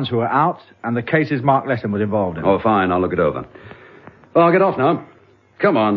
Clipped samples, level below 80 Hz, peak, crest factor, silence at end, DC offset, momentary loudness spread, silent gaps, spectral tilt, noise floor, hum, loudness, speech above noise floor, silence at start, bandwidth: under 0.1%; -52 dBFS; 0 dBFS; 18 dB; 0 s; under 0.1%; 9 LU; none; -9.5 dB/octave; -44 dBFS; none; -18 LUFS; 26 dB; 0 s; 5.8 kHz